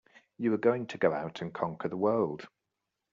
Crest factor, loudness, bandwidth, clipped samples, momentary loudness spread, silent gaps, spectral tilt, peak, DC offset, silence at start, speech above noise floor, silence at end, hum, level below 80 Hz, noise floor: 20 dB; -31 LUFS; 7.4 kHz; under 0.1%; 8 LU; none; -6 dB/octave; -12 dBFS; under 0.1%; 0.4 s; 55 dB; 0.65 s; none; -72 dBFS; -86 dBFS